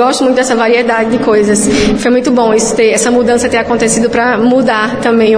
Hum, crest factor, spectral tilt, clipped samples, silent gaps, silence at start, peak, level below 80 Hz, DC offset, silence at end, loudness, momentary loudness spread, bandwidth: none; 8 dB; -4 dB/octave; under 0.1%; none; 0 s; 0 dBFS; -34 dBFS; under 0.1%; 0 s; -10 LUFS; 2 LU; 10.5 kHz